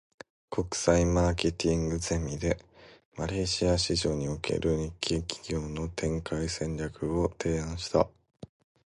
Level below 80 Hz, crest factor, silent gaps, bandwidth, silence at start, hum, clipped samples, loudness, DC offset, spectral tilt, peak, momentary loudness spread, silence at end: -42 dBFS; 20 dB; 3.05-3.12 s; 11.5 kHz; 0.5 s; none; under 0.1%; -30 LUFS; under 0.1%; -5 dB/octave; -10 dBFS; 8 LU; 0.85 s